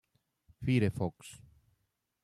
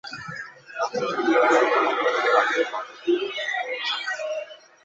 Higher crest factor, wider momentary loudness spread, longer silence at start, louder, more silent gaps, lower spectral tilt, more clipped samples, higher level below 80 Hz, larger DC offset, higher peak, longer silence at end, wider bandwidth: about the same, 20 dB vs 18 dB; first, 21 LU vs 16 LU; first, 0.6 s vs 0.05 s; second, -33 LUFS vs -23 LUFS; neither; first, -7.5 dB/octave vs -3 dB/octave; neither; first, -62 dBFS vs -72 dBFS; neither; second, -16 dBFS vs -6 dBFS; first, 0.85 s vs 0.3 s; first, 12.5 kHz vs 8 kHz